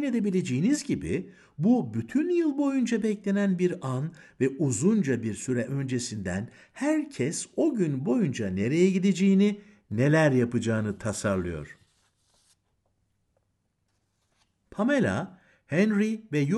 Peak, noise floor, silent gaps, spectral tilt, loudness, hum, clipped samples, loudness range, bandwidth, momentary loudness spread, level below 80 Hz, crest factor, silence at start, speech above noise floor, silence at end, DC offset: -10 dBFS; -75 dBFS; none; -6.5 dB/octave; -27 LUFS; none; under 0.1%; 8 LU; 12 kHz; 10 LU; -60 dBFS; 18 dB; 0 s; 49 dB; 0 s; under 0.1%